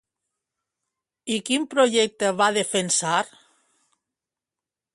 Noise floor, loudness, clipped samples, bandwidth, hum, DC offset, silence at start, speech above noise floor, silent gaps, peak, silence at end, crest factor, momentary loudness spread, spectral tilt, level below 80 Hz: -89 dBFS; -22 LUFS; under 0.1%; 11.5 kHz; none; under 0.1%; 1.25 s; 67 dB; none; -6 dBFS; 1.7 s; 20 dB; 9 LU; -2.5 dB/octave; -72 dBFS